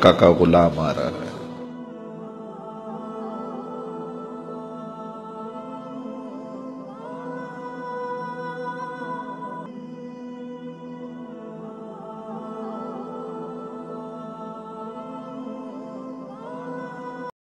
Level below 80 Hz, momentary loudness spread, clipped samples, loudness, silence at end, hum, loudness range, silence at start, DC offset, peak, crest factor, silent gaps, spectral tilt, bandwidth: -52 dBFS; 11 LU; under 0.1%; -28 LUFS; 0.1 s; none; 5 LU; 0 s; under 0.1%; 0 dBFS; 26 dB; none; -7 dB/octave; 12 kHz